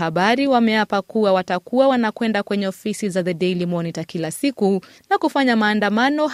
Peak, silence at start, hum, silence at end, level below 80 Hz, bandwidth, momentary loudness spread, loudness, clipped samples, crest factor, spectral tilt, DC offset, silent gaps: -4 dBFS; 0 s; none; 0 s; -64 dBFS; 15 kHz; 8 LU; -19 LUFS; under 0.1%; 16 dB; -5.5 dB/octave; under 0.1%; none